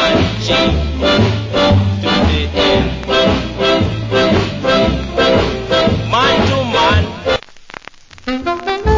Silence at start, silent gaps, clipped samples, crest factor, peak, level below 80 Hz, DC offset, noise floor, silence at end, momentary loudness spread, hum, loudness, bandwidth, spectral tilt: 0 s; none; under 0.1%; 14 dB; 0 dBFS; -24 dBFS; under 0.1%; -37 dBFS; 0 s; 7 LU; none; -14 LUFS; 7.6 kHz; -5.5 dB/octave